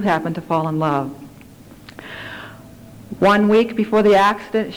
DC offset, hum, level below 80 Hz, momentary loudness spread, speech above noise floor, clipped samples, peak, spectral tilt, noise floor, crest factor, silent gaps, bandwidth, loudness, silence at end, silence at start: under 0.1%; none; -52 dBFS; 22 LU; 25 dB; under 0.1%; -8 dBFS; -6.5 dB/octave; -42 dBFS; 12 dB; none; 19.5 kHz; -17 LUFS; 0 s; 0 s